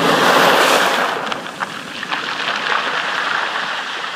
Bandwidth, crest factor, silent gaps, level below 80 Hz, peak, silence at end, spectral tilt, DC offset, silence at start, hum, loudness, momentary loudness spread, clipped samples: 15.5 kHz; 18 dB; none; -64 dBFS; 0 dBFS; 0 s; -2 dB/octave; under 0.1%; 0 s; none; -16 LUFS; 13 LU; under 0.1%